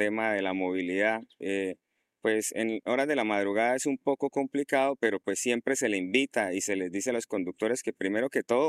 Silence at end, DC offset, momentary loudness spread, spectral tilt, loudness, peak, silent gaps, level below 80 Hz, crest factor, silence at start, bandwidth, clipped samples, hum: 0 s; under 0.1%; 5 LU; -3.5 dB/octave; -29 LUFS; -12 dBFS; none; -78 dBFS; 18 dB; 0 s; 15.5 kHz; under 0.1%; none